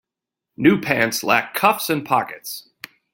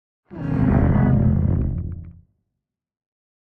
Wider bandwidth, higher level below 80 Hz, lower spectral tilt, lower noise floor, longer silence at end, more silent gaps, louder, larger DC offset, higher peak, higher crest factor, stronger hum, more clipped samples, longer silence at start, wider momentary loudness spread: first, 17 kHz vs 3.2 kHz; second, -60 dBFS vs -32 dBFS; second, -4 dB/octave vs -12 dB/octave; about the same, -85 dBFS vs -82 dBFS; second, 0.55 s vs 1.3 s; neither; about the same, -19 LUFS vs -20 LUFS; neither; first, 0 dBFS vs -4 dBFS; about the same, 20 dB vs 16 dB; neither; neither; first, 0.6 s vs 0.3 s; about the same, 15 LU vs 16 LU